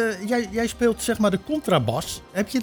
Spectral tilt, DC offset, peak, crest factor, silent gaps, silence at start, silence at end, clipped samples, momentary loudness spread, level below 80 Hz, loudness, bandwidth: -5 dB/octave; under 0.1%; -8 dBFS; 16 dB; none; 0 s; 0 s; under 0.1%; 6 LU; -48 dBFS; -23 LUFS; over 20 kHz